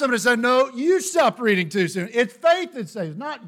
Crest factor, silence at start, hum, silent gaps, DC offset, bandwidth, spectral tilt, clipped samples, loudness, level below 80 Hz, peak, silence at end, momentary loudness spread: 16 dB; 0 s; none; none; under 0.1%; 17 kHz; -4 dB/octave; under 0.1%; -21 LUFS; -68 dBFS; -4 dBFS; 0 s; 11 LU